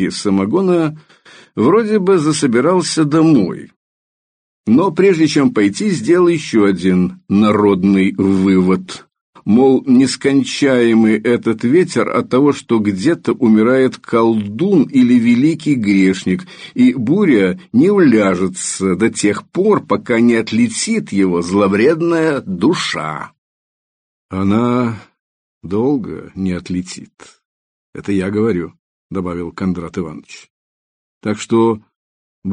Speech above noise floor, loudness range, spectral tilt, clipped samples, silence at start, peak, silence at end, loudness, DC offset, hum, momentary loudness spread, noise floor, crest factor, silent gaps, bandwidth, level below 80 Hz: over 77 dB; 8 LU; -6 dB/octave; under 0.1%; 0 s; 0 dBFS; 0 s; -14 LUFS; under 0.1%; none; 12 LU; under -90 dBFS; 14 dB; 3.76-4.64 s, 9.21-9.33 s, 23.38-24.29 s, 25.19-25.61 s, 27.45-27.93 s, 28.79-29.10 s, 30.50-31.21 s, 31.96-32.42 s; 10 kHz; -54 dBFS